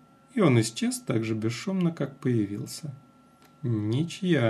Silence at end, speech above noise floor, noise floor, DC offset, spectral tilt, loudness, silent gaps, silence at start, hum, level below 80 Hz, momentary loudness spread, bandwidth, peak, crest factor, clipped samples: 0 s; 30 dB; -57 dBFS; under 0.1%; -6 dB/octave; -28 LUFS; none; 0.35 s; none; -70 dBFS; 13 LU; 13.5 kHz; -10 dBFS; 18 dB; under 0.1%